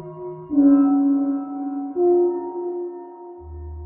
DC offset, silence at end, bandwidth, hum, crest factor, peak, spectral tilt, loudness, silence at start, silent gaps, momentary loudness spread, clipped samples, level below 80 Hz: under 0.1%; 0 s; 1.9 kHz; none; 14 dB; -6 dBFS; -12.5 dB/octave; -20 LUFS; 0 s; none; 21 LU; under 0.1%; -46 dBFS